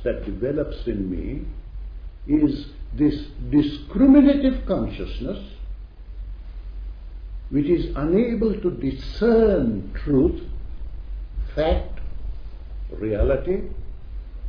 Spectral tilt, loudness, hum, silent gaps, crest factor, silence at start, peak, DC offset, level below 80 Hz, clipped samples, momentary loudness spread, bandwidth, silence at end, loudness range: -10 dB/octave; -22 LUFS; none; none; 18 dB; 0 s; -4 dBFS; under 0.1%; -32 dBFS; under 0.1%; 21 LU; 5.4 kHz; 0 s; 7 LU